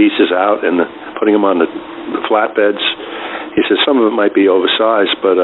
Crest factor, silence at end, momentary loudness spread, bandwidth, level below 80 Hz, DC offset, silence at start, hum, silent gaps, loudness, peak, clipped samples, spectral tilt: 12 dB; 0 s; 10 LU; 4.1 kHz; -56 dBFS; under 0.1%; 0 s; none; none; -13 LUFS; 0 dBFS; under 0.1%; -9 dB/octave